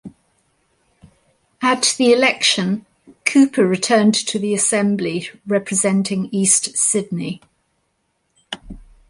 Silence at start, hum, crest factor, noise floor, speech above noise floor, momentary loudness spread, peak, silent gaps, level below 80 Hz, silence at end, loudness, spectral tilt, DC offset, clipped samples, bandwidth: 0.05 s; none; 18 dB; -69 dBFS; 51 dB; 13 LU; 0 dBFS; none; -54 dBFS; 0.3 s; -17 LUFS; -3 dB/octave; under 0.1%; under 0.1%; 11.5 kHz